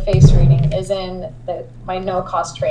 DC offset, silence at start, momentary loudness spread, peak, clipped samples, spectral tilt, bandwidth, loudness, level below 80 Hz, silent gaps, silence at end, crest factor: under 0.1%; 0 s; 17 LU; 0 dBFS; under 0.1%; -7.5 dB/octave; 10 kHz; -16 LUFS; -22 dBFS; none; 0 s; 14 dB